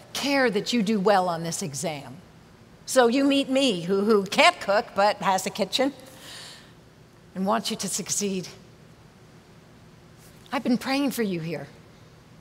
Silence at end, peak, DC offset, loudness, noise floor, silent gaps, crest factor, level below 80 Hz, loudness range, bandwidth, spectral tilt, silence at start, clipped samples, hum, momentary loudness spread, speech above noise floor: 0.35 s; -4 dBFS; under 0.1%; -24 LUFS; -52 dBFS; none; 22 dB; -64 dBFS; 9 LU; 16 kHz; -3.5 dB/octave; 0 s; under 0.1%; none; 20 LU; 28 dB